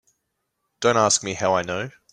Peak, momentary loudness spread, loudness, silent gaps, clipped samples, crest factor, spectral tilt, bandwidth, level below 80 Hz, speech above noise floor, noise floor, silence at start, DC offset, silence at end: -4 dBFS; 10 LU; -21 LUFS; none; under 0.1%; 20 dB; -3 dB/octave; 11.5 kHz; -62 dBFS; 55 dB; -77 dBFS; 0.8 s; under 0.1%; 0.2 s